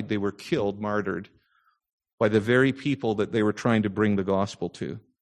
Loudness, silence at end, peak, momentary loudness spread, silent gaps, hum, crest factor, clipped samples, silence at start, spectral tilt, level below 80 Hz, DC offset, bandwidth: -26 LUFS; 0.2 s; -8 dBFS; 11 LU; 1.92-1.98 s, 2.13-2.18 s; none; 18 dB; under 0.1%; 0 s; -7 dB/octave; -56 dBFS; under 0.1%; 12 kHz